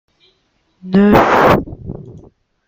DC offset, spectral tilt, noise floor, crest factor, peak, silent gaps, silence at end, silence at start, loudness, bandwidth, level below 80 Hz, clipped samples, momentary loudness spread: under 0.1%; -7.5 dB/octave; -61 dBFS; 16 dB; 0 dBFS; none; 0.5 s; 0.85 s; -11 LUFS; 16.5 kHz; -36 dBFS; under 0.1%; 21 LU